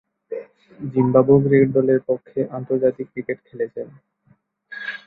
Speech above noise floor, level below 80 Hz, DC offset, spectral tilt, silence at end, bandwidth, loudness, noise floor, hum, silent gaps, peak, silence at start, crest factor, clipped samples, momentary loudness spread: 41 dB; -58 dBFS; under 0.1%; -11 dB/octave; 0.1 s; 4.6 kHz; -20 LUFS; -60 dBFS; none; none; -2 dBFS; 0.3 s; 18 dB; under 0.1%; 19 LU